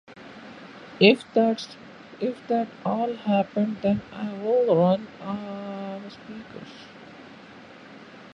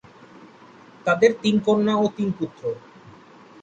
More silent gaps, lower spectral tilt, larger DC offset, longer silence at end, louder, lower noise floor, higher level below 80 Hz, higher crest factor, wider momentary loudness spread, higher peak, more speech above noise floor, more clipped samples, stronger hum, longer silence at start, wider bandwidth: neither; about the same, -7 dB/octave vs -6 dB/octave; neither; second, 0.05 s vs 0.5 s; about the same, -24 LUFS vs -22 LUFS; about the same, -46 dBFS vs -48 dBFS; about the same, -64 dBFS vs -62 dBFS; about the same, 24 dB vs 20 dB; first, 25 LU vs 13 LU; about the same, -4 dBFS vs -4 dBFS; second, 22 dB vs 27 dB; neither; neither; second, 0.1 s vs 0.4 s; first, 10 kHz vs 8.4 kHz